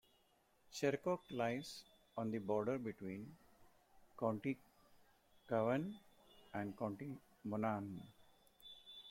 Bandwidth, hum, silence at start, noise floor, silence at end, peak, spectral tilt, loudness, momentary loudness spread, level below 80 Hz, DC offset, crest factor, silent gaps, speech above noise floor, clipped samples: 16.5 kHz; none; 0.7 s; -75 dBFS; 0 s; -24 dBFS; -6.5 dB/octave; -43 LUFS; 16 LU; -78 dBFS; under 0.1%; 22 dB; none; 33 dB; under 0.1%